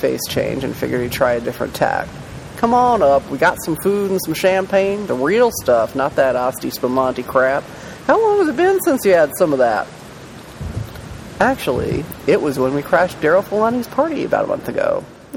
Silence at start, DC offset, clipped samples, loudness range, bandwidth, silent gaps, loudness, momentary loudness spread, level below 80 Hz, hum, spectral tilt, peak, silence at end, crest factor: 0 s; under 0.1%; under 0.1%; 3 LU; 17 kHz; none; -17 LUFS; 14 LU; -44 dBFS; none; -5 dB/octave; 0 dBFS; 0 s; 16 dB